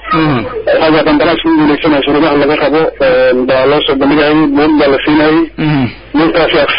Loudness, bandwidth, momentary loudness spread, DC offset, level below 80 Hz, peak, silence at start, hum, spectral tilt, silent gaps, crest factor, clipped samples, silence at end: -9 LUFS; 5.4 kHz; 4 LU; under 0.1%; -34 dBFS; 0 dBFS; 0 s; none; -11.5 dB/octave; none; 8 dB; under 0.1%; 0 s